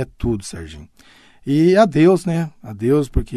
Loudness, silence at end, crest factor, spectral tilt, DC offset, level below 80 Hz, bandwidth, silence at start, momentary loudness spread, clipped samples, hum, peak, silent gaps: -17 LUFS; 0 s; 16 dB; -7 dB/octave; under 0.1%; -32 dBFS; 13.5 kHz; 0 s; 19 LU; under 0.1%; none; -2 dBFS; none